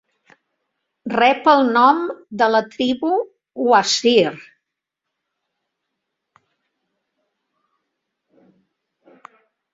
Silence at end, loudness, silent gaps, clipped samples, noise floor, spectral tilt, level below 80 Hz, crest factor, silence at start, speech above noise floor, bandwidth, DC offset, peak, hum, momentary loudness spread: 5.35 s; -17 LUFS; none; under 0.1%; -81 dBFS; -3.5 dB/octave; -66 dBFS; 20 dB; 1.05 s; 65 dB; 7.8 kHz; under 0.1%; -2 dBFS; none; 10 LU